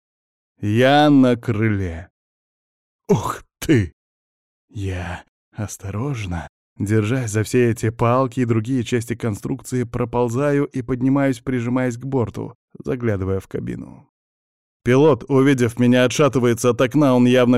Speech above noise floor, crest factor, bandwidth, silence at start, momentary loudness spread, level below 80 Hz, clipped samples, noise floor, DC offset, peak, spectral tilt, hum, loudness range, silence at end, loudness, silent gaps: over 72 dB; 14 dB; 14.5 kHz; 0.6 s; 15 LU; -46 dBFS; under 0.1%; under -90 dBFS; 0.2%; -4 dBFS; -6.5 dB/octave; none; 7 LU; 0 s; -19 LUFS; 2.10-2.99 s, 3.93-4.68 s, 5.29-5.52 s, 6.49-6.76 s, 12.55-12.68 s, 14.09-14.80 s